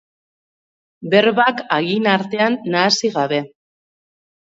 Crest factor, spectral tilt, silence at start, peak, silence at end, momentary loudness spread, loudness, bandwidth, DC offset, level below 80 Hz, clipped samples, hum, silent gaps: 18 dB; -4 dB/octave; 1 s; 0 dBFS; 1.05 s; 7 LU; -17 LUFS; 7.8 kHz; under 0.1%; -68 dBFS; under 0.1%; none; none